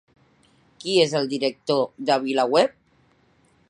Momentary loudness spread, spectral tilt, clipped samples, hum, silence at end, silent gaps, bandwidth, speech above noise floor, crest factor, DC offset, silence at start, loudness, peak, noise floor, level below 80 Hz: 6 LU; -4.5 dB/octave; under 0.1%; none; 1 s; none; 11 kHz; 40 dB; 20 dB; under 0.1%; 0.85 s; -22 LUFS; -4 dBFS; -61 dBFS; -72 dBFS